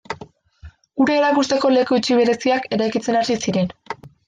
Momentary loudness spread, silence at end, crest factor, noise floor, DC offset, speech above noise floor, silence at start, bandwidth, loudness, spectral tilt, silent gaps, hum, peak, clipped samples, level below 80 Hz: 16 LU; 0.35 s; 14 dB; -44 dBFS; under 0.1%; 27 dB; 0.1 s; 9.6 kHz; -18 LUFS; -5 dB/octave; none; none; -6 dBFS; under 0.1%; -56 dBFS